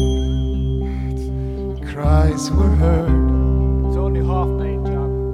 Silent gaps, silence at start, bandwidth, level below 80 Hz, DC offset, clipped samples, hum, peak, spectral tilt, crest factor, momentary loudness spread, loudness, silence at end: none; 0 s; 10 kHz; -20 dBFS; under 0.1%; under 0.1%; none; -4 dBFS; -7.5 dB/octave; 12 dB; 9 LU; -19 LUFS; 0 s